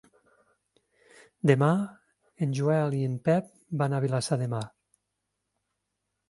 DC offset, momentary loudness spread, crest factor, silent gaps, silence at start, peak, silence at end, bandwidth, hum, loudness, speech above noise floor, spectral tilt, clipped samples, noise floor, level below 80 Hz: under 0.1%; 11 LU; 24 dB; none; 1.45 s; -6 dBFS; 1.6 s; 11.5 kHz; 50 Hz at -55 dBFS; -28 LUFS; 56 dB; -7 dB/octave; under 0.1%; -82 dBFS; -70 dBFS